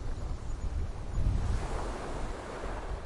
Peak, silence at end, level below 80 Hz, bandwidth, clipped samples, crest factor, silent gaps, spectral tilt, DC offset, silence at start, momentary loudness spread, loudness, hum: -16 dBFS; 0 s; -36 dBFS; 11.5 kHz; under 0.1%; 16 dB; none; -6.5 dB/octave; under 0.1%; 0 s; 7 LU; -37 LUFS; none